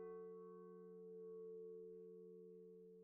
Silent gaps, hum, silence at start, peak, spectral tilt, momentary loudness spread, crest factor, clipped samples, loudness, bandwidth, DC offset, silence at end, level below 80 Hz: none; none; 0 s; -46 dBFS; -7 dB/octave; 6 LU; 12 dB; under 0.1%; -58 LUFS; 2.5 kHz; under 0.1%; 0 s; under -90 dBFS